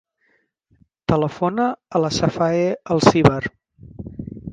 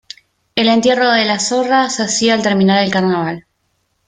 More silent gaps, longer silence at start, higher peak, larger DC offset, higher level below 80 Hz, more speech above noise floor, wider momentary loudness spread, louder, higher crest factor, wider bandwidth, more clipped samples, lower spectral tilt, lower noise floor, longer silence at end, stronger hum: neither; first, 1.1 s vs 0.55 s; about the same, 0 dBFS vs 0 dBFS; neither; first, -46 dBFS vs -56 dBFS; second, 47 dB vs 52 dB; first, 18 LU vs 7 LU; second, -19 LUFS vs -14 LUFS; first, 20 dB vs 14 dB; about the same, 9.6 kHz vs 9.6 kHz; neither; first, -6 dB/octave vs -4 dB/octave; about the same, -65 dBFS vs -65 dBFS; second, 0 s vs 0.65 s; neither